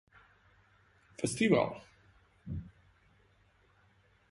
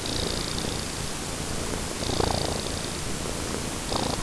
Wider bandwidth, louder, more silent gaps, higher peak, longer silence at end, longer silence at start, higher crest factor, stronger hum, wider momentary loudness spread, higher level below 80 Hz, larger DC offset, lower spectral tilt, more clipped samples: about the same, 11.5 kHz vs 11 kHz; second, -33 LUFS vs -29 LUFS; neither; second, -14 dBFS vs -10 dBFS; first, 1.6 s vs 0 s; first, 1.2 s vs 0 s; first, 24 dB vs 18 dB; neither; first, 27 LU vs 5 LU; second, -60 dBFS vs -38 dBFS; neither; first, -5 dB/octave vs -3.5 dB/octave; neither